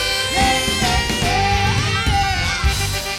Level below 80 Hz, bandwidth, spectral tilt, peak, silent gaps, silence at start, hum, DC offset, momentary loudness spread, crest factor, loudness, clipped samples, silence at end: -26 dBFS; 17 kHz; -3 dB/octave; -4 dBFS; none; 0 s; none; under 0.1%; 3 LU; 14 dB; -17 LUFS; under 0.1%; 0 s